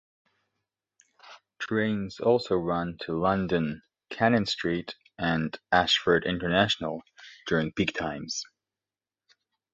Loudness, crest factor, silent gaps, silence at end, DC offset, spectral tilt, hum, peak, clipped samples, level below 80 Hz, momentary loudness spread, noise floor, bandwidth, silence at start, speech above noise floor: -27 LUFS; 22 dB; none; 1.3 s; under 0.1%; -5 dB/octave; none; -6 dBFS; under 0.1%; -56 dBFS; 12 LU; under -90 dBFS; 8 kHz; 1.25 s; over 63 dB